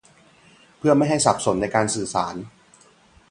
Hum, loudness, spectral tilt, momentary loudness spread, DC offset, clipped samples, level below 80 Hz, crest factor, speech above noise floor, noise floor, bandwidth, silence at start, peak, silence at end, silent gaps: none; -21 LUFS; -4.5 dB/octave; 12 LU; under 0.1%; under 0.1%; -52 dBFS; 22 dB; 34 dB; -54 dBFS; 11.5 kHz; 0.85 s; 0 dBFS; 0.85 s; none